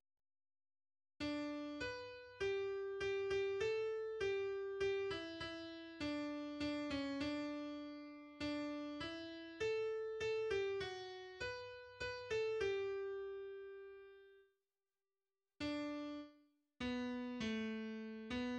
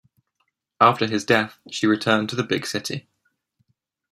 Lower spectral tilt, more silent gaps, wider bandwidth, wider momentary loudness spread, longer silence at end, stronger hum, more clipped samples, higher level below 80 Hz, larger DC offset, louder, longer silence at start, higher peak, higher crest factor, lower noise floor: about the same, -5 dB/octave vs -4.5 dB/octave; neither; second, 9.8 kHz vs 15.5 kHz; about the same, 11 LU vs 11 LU; second, 0 s vs 1.15 s; neither; neither; about the same, -70 dBFS vs -66 dBFS; neither; second, -44 LUFS vs -21 LUFS; first, 1.2 s vs 0.8 s; second, -30 dBFS vs -2 dBFS; second, 14 dB vs 22 dB; first, under -90 dBFS vs -74 dBFS